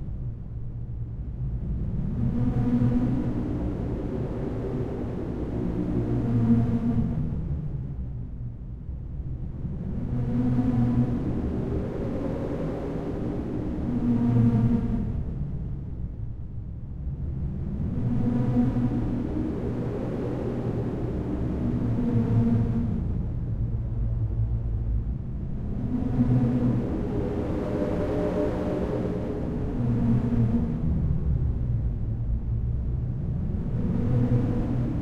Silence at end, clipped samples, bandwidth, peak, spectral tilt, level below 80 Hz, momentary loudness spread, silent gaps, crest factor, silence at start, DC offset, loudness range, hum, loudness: 0 s; under 0.1%; 5 kHz; -10 dBFS; -10.5 dB/octave; -34 dBFS; 11 LU; none; 16 dB; 0 s; under 0.1%; 3 LU; none; -28 LUFS